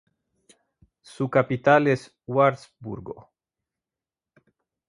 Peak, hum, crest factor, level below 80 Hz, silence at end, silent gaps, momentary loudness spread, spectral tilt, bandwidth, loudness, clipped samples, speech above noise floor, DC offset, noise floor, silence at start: -4 dBFS; none; 24 dB; -64 dBFS; 1.7 s; none; 19 LU; -7 dB/octave; 11 kHz; -22 LUFS; under 0.1%; over 67 dB; under 0.1%; under -90 dBFS; 1.2 s